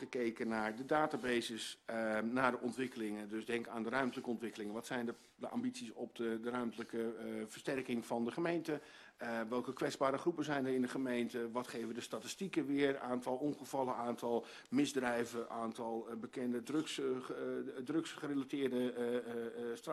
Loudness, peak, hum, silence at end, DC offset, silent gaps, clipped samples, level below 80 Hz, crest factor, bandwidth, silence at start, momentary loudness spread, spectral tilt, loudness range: -40 LUFS; -18 dBFS; none; 0 s; under 0.1%; none; under 0.1%; -78 dBFS; 22 dB; 13 kHz; 0 s; 8 LU; -5 dB/octave; 3 LU